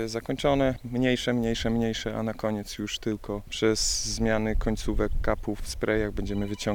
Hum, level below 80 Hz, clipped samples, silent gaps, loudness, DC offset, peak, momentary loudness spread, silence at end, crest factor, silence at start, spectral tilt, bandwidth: none; -36 dBFS; under 0.1%; none; -28 LUFS; under 0.1%; -10 dBFS; 7 LU; 0 s; 18 dB; 0 s; -4.5 dB/octave; 18.5 kHz